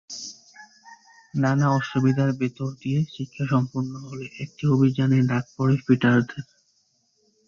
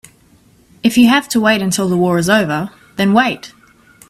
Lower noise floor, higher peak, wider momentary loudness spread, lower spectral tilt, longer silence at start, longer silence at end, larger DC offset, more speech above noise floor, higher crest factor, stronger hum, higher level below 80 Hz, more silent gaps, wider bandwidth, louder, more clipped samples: first, -67 dBFS vs -49 dBFS; second, -6 dBFS vs 0 dBFS; first, 15 LU vs 9 LU; first, -7 dB/octave vs -4.5 dB/octave; second, 0.1 s vs 0.85 s; first, 1.05 s vs 0.6 s; neither; first, 45 dB vs 36 dB; about the same, 18 dB vs 14 dB; neither; second, -60 dBFS vs -52 dBFS; neither; second, 7.4 kHz vs 15.5 kHz; second, -23 LUFS vs -14 LUFS; neither